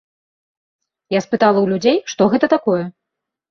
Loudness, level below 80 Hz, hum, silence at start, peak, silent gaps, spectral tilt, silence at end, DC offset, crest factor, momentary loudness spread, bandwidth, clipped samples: -16 LUFS; -60 dBFS; none; 1.1 s; -2 dBFS; none; -5.5 dB/octave; 0.6 s; under 0.1%; 16 dB; 7 LU; 7.2 kHz; under 0.1%